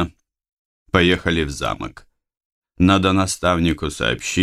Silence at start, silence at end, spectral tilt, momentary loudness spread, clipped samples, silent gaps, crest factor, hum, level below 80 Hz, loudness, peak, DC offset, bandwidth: 0 s; 0 s; -5 dB/octave; 10 LU; under 0.1%; 0.53-0.86 s, 2.45-2.62 s; 20 dB; none; -38 dBFS; -19 LUFS; 0 dBFS; under 0.1%; 14 kHz